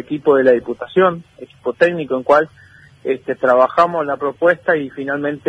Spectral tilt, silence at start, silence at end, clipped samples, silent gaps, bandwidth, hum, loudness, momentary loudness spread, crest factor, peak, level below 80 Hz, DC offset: -7 dB/octave; 0.1 s; 0.1 s; under 0.1%; none; 9 kHz; none; -16 LUFS; 11 LU; 16 dB; 0 dBFS; -58 dBFS; under 0.1%